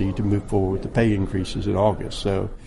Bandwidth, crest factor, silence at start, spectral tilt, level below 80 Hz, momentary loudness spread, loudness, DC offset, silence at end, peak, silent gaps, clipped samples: 11.5 kHz; 16 dB; 0 s; -7 dB/octave; -34 dBFS; 5 LU; -23 LUFS; under 0.1%; 0 s; -6 dBFS; none; under 0.1%